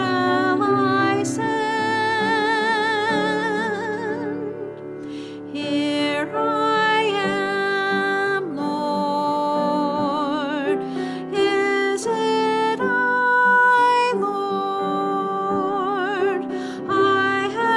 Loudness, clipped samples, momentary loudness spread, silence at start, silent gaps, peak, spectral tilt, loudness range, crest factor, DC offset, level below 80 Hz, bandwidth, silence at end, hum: -21 LUFS; under 0.1%; 9 LU; 0 s; none; -8 dBFS; -4.5 dB/octave; 5 LU; 12 dB; under 0.1%; -64 dBFS; 12 kHz; 0 s; none